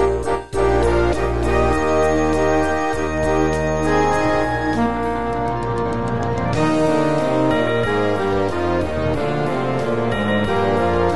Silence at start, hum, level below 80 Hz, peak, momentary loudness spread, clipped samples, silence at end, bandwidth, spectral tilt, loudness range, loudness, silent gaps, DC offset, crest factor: 0 s; none; -32 dBFS; -4 dBFS; 5 LU; under 0.1%; 0 s; 11.5 kHz; -6.5 dB/octave; 2 LU; -19 LUFS; none; 3%; 14 dB